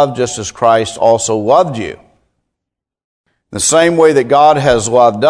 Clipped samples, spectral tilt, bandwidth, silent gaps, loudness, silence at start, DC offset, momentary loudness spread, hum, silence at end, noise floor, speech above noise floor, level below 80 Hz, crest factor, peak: 0.4%; -4 dB/octave; 11 kHz; 3.04-3.24 s; -11 LUFS; 0 s; under 0.1%; 9 LU; none; 0 s; -80 dBFS; 70 dB; -44 dBFS; 12 dB; 0 dBFS